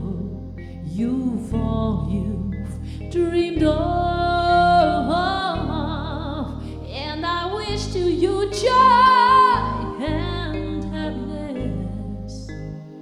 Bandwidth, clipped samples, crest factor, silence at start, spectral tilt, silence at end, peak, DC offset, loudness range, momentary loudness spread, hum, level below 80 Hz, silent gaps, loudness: 11.5 kHz; under 0.1%; 16 dB; 0 s; -6 dB/octave; 0 s; -4 dBFS; under 0.1%; 7 LU; 18 LU; none; -34 dBFS; none; -21 LUFS